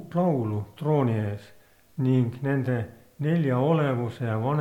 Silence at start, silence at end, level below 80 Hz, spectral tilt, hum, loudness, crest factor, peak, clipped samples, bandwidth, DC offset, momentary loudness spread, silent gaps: 0 s; 0 s; -64 dBFS; -9.5 dB/octave; none; -26 LUFS; 16 dB; -10 dBFS; under 0.1%; 12 kHz; under 0.1%; 9 LU; none